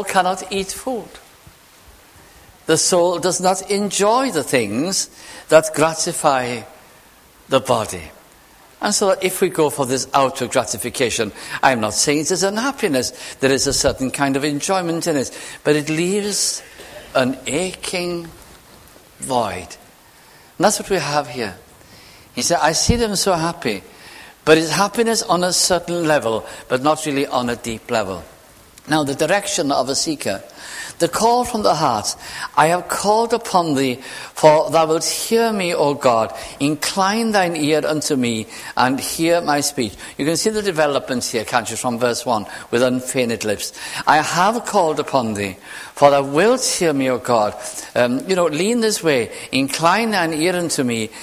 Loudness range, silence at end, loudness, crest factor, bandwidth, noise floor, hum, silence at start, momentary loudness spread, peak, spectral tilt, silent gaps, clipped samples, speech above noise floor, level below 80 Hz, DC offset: 4 LU; 0 s; -18 LUFS; 18 dB; 16 kHz; -48 dBFS; none; 0 s; 10 LU; 0 dBFS; -3.5 dB/octave; none; under 0.1%; 30 dB; -46 dBFS; under 0.1%